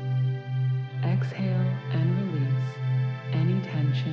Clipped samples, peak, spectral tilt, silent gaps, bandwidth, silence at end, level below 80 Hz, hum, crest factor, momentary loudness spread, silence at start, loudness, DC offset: under 0.1%; -14 dBFS; -9 dB/octave; none; 5.6 kHz; 0 s; -72 dBFS; none; 10 dB; 3 LU; 0 s; -27 LUFS; under 0.1%